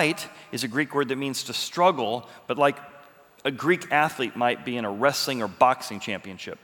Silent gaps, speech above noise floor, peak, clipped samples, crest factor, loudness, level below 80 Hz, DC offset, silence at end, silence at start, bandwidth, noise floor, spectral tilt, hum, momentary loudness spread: none; 26 dB; -4 dBFS; under 0.1%; 22 dB; -25 LUFS; -74 dBFS; under 0.1%; 0.1 s; 0 s; over 20 kHz; -52 dBFS; -4 dB/octave; none; 11 LU